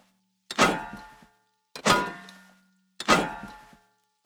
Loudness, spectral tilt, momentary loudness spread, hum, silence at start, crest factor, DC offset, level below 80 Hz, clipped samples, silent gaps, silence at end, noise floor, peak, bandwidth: -25 LUFS; -3 dB/octave; 22 LU; none; 0.5 s; 24 dB; under 0.1%; -54 dBFS; under 0.1%; none; 0.7 s; -67 dBFS; -4 dBFS; over 20 kHz